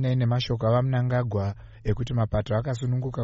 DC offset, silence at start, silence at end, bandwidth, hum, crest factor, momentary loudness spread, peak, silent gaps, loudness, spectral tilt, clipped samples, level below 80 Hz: under 0.1%; 0 s; 0 s; 7.6 kHz; none; 14 dB; 6 LU; -12 dBFS; none; -26 LUFS; -7 dB/octave; under 0.1%; -42 dBFS